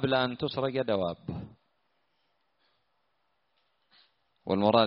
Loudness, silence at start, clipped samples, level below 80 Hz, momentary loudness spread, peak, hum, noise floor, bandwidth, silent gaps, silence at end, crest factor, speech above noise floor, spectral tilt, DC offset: -30 LUFS; 0 s; under 0.1%; -64 dBFS; 15 LU; -8 dBFS; none; -77 dBFS; 5.6 kHz; none; 0 s; 24 dB; 50 dB; -4 dB/octave; under 0.1%